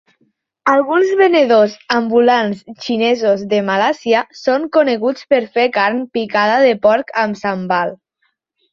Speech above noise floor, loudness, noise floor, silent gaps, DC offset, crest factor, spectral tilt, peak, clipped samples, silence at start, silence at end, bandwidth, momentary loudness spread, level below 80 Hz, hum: 52 dB; -15 LUFS; -67 dBFS; none; under 0.1%; 14 dB; -5.5 dB/octave; -2 dBFS; under 0.1%; 0.65 s; 0.8 s; 7.2 kHz; 7 LU; -62 dBFS; none